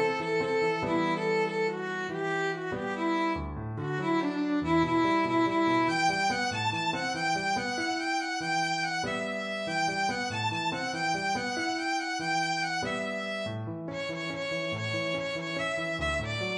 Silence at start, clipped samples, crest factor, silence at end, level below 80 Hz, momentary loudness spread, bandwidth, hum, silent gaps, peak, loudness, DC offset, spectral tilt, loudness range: 0 s; under 0.1%; 14 dB; 0 s; -54 dBFS; 7 LU; 11 kHz; none; none; -14 dBFS; -29 LUFS; under 0.1%; -4.5 dB/octave; 4 LU